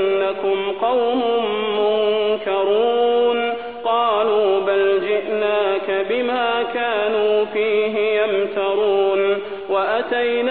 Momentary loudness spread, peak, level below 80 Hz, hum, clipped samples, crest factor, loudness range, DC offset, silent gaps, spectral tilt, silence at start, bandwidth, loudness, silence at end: 4 LU; -6 dBFS; -60 dBFS; none; under 0.1%; 12 dB; 1 LU; 0.4%; none; -7.5 dB/octave; 0 s; 4.4 kHz; -19 LUFS; 0 s